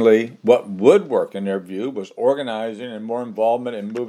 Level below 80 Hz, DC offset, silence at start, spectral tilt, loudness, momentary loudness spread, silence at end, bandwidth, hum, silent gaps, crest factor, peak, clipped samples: -80 dBFS; under 0.1%; 0 s; -6.5 dB/octave; -20 LUFS; 12 LU; 0 s; 12 kHz; none; none; 18 dB; 0 dBFS; under 0.1%